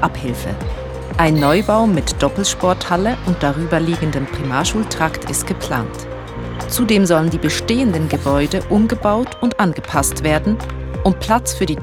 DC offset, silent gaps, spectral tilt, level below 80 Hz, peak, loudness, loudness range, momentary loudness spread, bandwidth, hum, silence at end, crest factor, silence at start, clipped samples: under 0.1%; none; -5 dB/octave; -30 dBFS; 0 dBFS; -17 LUFS; 3 LU; 10 LU; over 20 kHz; none; 0 s; 16 dB; 0 s; under 0.1%